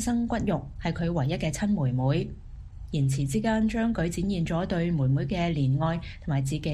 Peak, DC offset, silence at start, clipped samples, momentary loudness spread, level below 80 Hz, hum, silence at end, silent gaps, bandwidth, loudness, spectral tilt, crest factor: -14 dBFS; under 0.1%; 0 s; under 0.1%; 7 LU; -42 dBFS; none; 0 s; none; 12.5 kHz; -27 LUFS; -6.5 dB/octave; 14 dB